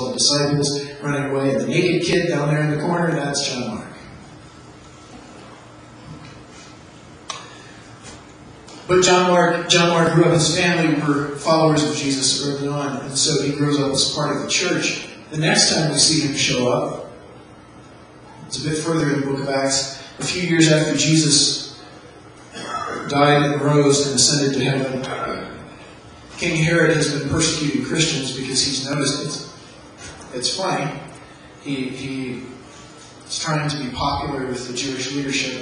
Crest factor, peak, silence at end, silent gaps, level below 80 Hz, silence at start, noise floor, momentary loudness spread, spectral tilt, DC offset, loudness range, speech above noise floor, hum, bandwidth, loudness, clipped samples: 20 dB; 0 dBFS; 0 s; none; -50 dBFS; 0 s; -43 dBFS; 22 LU; -3.5 dB/octave; under 0.1%; 10 LU; 24 dB; none; 11 kHz; -19 LUFS; under 0.1%